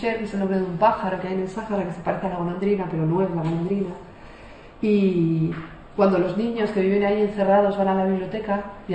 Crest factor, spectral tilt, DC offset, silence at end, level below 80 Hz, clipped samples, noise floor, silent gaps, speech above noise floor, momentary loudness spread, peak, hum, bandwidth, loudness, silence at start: 16 dB; -8.5 dB/octave; under 0.1%; 0 s; -50 dBFS; under 0.1%; -43 dBFS; none; 21 dB; 8 LU; -6 dBFS; none; 8.6 kHz; -23 LUFS; 0 s